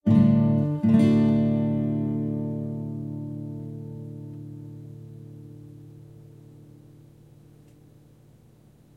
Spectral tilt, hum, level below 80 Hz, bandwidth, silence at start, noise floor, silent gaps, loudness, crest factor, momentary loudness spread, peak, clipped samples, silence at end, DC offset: -10 dB/octave; none; -56 dBFS; 4.8 kHz; 0.05 s; -55 dBFS; none; -24 LUFS; 18 dB; 25 LU; -8 dBFS; under 0.1%; 2.95 s; under 0.1%